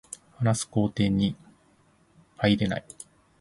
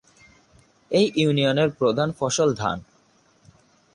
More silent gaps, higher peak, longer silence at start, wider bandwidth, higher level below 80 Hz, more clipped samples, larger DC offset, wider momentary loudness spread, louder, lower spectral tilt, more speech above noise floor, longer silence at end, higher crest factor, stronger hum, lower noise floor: neither; about the same, -8 dBFS vs -8 dBFS; second, 0.4 s vs 0.9 s; about the same, 11.5 kHz vs 11.5 kHz; first, -52 dBFS vs -58 dBFS; neither; neither; first, 21 LU vs 7 LU; second, -26 LUFS vs -22 LUFS; about the same, -5.5 dB/octave vs -5 dB/octave; about the same, 37 dB vs 39 dB; second, 0.35 s vs 1.1 s; about the same, 20 dB vs 16 dB; neither; about the same, -62 dBFS vs -60 dBFS